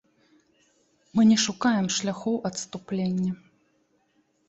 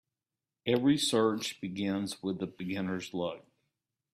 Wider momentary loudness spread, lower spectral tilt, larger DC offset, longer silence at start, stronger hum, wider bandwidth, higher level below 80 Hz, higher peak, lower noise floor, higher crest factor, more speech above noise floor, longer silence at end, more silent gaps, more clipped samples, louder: about the same, 12 LU vs 11 LU; about the same, -4.5 dB/octave vs -4.5 dB/octave; neither; first, 1.15 s vs 0.65 s; neither; second, 8.2 kHz vs 15 kHz; first, -66 dBFS vs -72 dBFS; first, -10 dBFS vs -16 dBFS; second, -69 dBFS vs under -90 dBFS; about the same, 18 dB vs 18 dB; second, 44 dB vs over 59 dB; first, 1.15 s vs 0.75 s; neither; neither; first, -25 LUFS vs -32 LUFS